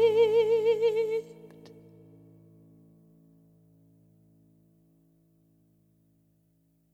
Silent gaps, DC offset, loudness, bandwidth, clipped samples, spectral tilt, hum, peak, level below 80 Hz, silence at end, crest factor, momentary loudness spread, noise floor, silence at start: none; under 0.1%; -25 LUFS; 8 kHz; under 0.1%; -5 dB/octave; none; -14 dBFS; -80 dBFS; 5.5 s; 18 dB; 28 LU; -69 dBFS; 0 s